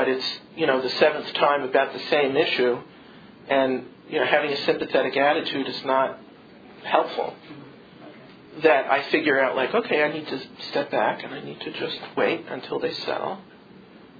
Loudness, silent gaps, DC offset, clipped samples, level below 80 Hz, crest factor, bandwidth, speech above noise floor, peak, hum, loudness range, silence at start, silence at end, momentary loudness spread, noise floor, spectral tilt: -23 LUFS; none; under 0.1%; under 0.1%; -70 dBFS; 22 dB; 5 kHz; 24 dB; -2 dBFS; none; 5 LU; 0 s; 0.15 s; 12 LU; -48 dBFS; -5.5 dB/octave